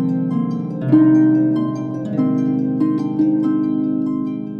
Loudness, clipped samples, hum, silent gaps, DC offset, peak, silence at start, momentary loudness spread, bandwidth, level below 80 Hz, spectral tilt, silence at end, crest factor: -17 LUFS; under 0.1%; none; none; under 0.1%; -2 dBFS; 0 s; 10 LU; 4.9 kHz; -62 dBFS; -10 dB/octave; 0 s; 14 dB